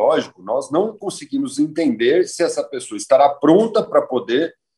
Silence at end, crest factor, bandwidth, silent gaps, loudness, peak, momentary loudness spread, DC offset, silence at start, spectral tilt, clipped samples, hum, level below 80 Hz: 0.25 s; 16 dB; 12 kHz; none; -18 LUFS; -2 dBFS; 11 LU; under 0.1%; 0 s; -5 dB/octave; under 0.1%; none; -68 dBFS